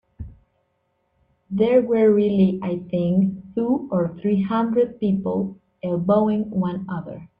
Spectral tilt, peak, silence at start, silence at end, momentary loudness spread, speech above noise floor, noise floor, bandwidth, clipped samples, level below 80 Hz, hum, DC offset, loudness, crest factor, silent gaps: -11 dB/octave; -6 dBFS; 0.2 s; 0.15 s; 14 LU; 50 dB; -70 dBFS; 4.7 kHz; under 0.1%; -54 dBFS; none; under 0.1%; -21 LUFS; 16 dB; none